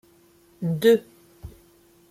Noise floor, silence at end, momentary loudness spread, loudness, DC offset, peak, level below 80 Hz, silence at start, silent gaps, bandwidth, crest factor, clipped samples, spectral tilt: -57 dBFS; 0.6 s; 26 LU; -22 LUFS; under 0.1%; -6 dBFS; -54 dBFS; 0.6 s; none; 15.5 kHz; 20 dB; under 0.1%; -6.5 dB/octave